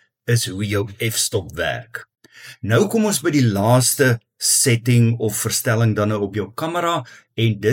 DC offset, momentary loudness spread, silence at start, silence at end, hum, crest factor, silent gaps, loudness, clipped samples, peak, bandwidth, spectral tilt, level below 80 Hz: under 0.1%; 10 LU; 0.25 s; 0 s; none; 16 dB; none; -19 LUFS; under 0.1%; -4 dBFS; 17.5 kHz; -4.5 dB/octave; -54 dBFS